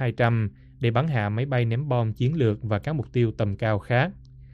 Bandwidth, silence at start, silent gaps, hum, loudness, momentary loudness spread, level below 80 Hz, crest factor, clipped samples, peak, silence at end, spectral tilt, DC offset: 5.2 kHz; 0 s; none; none; -25 LUFS; 4 LU; -50 dBFS; 16 dB; under 0.1%; -8 dBFS; 0.05 s; -9 dB/octave; under 0.1%